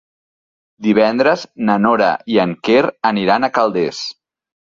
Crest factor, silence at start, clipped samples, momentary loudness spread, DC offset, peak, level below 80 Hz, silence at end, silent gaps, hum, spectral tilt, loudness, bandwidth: 14 dB; 0.8 s; under 0.1%; 7 LU; under 0.1%; -2 dBFS; -58 dBFS; 0.65 s; none; none; -6 dB/octave; -15 LUFS; 7.4 kHz